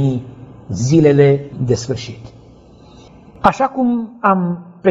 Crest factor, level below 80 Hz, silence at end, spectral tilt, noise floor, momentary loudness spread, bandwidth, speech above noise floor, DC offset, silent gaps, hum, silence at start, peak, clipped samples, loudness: 16 dB; -46 dBFS; 0 s; -7 dB/octave; -43 dBFS; 16 LU; 8 kHz; 28 dB; under 0.1%; none; none; 0 s; 0 dBFS; under 0.1%; -16 LUFS